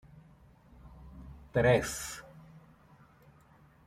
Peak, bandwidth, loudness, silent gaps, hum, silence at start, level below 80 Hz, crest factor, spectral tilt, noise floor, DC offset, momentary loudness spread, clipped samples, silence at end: -12 dBFS; 15.5 kHz; -30 LUFS; none; none; 0.85 s; -54 dBFS; 24 dB; -5 dB/octave; -61 dBFS; under 0.1%; 27 LU; under 0.1%; 1.3 s